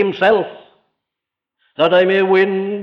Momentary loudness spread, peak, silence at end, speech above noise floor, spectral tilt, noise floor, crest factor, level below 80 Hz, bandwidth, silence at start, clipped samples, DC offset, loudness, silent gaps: 11 LU; -2 dBFS; 0 s; 69 dB; -7 dB/octave; -83 dBFS; 14 dB; -60 dBFS; 6 kHz; 0 s; under 0.1%; under 0.1%; -14 LUFS; none